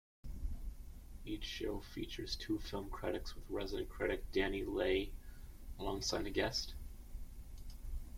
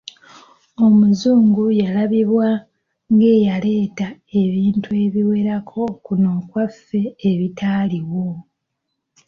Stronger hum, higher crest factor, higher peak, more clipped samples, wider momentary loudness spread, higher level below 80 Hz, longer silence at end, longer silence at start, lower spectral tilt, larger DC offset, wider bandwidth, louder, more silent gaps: neither; first, 20 dB vs 12 dB; second, -20 dBFS vs -6 dBFS; neither; first, 18 LU vs 11 LU; first, -48 dBFS vs -56 dBFS; second, 0 s vs 0.85 s; second, 0.25 s vs 0.8 s; second, -4.5 dB/octave vs -8.5 dB/octave; neither; first, 16.5 kHz vs 6.8 kHz; second, -41 LUFS vs -17 LUFS; neither